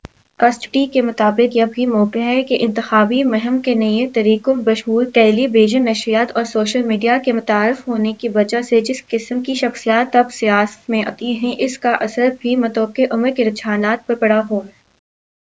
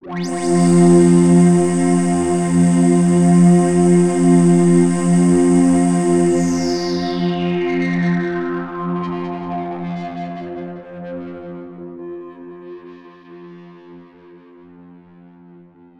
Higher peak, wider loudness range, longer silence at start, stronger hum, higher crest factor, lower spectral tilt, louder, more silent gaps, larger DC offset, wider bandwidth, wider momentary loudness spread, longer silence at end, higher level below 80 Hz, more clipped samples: about the same, 0 dBFS vs -2 dBFS; second, 3 LU vs 20 LU; first, 0.4 s vs 0.05 s; neither; about the same, 16 dB vs 14 dB; second, -5 dB/octave vs -7 dB/octave; about the same, -16 LUFS vs -15 LUFS; neither; first, 0.1% vs under 0.1%; second, 8 kHz vs 10.5 kHz; second, 6 LU vs 21 LU; second, 0.9 s vs 2 s; second, -62 dBFS vs -52 dBFS; neither